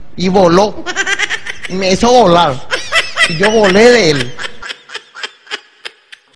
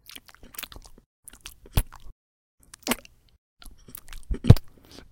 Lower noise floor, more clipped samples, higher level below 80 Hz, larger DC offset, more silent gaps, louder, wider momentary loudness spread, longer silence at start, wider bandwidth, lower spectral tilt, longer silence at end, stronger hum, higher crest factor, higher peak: second, -34 dBFS vs -48 dBFS; first, 0.7% vs under 0.1%; second, -40 dBFS vs -34 dBFS; first, 6% vs under 0.1%; second, none vs 2.12-2.58 s, 3.38-3.57 s; first, -11 LUFS vs -25 LUFS; second, 19 LU vs 26 LU; second, 0 s vs 1.75 s; second, 11 kHz vs 17 kHz; second, -4 dB/octave vs -6 dB/octave; second, 0 s vs 0.45 s; neither; second, 12 dB vs 28 dB; about the same, 0 dBFS vs 0 dBFS